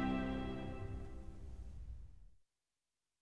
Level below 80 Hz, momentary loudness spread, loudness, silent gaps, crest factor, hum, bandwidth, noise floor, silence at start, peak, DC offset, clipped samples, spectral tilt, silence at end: -52 dBFS; 15 LU; -46 LUFS; none; 18 dB; none; 11 kHz; under -90 dBFS; 0 s; -28 dBFS; 0.2%; under 0.1%; -7.5 dB/octave; 0 s